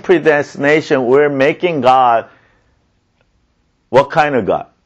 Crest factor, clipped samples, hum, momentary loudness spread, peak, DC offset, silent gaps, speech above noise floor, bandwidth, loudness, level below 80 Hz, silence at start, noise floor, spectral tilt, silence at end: 14 dB; under 0.1%; none; 4 LU; 0 dBFS; under 0.1%; none; 48 dB; 8.4 kHz; -13 LUFS; -52 dBFS; 0.05 s; -60 dBFS; -6 dB/octave; 0.2 s